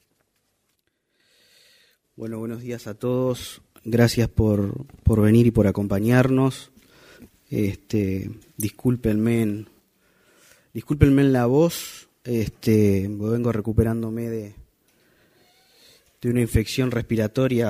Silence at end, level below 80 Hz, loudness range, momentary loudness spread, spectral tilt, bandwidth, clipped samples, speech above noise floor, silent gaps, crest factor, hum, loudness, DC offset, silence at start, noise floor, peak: 0 s; -40 dBFS; 7 LU; 15 LU; -7 dB/octave; 15.5 kHz; under 0.1%; 51 dB; none; 22 dB; none; -22 LUFS; under 0.1%; 2.2 s; -72 dBFS; 0 dBFS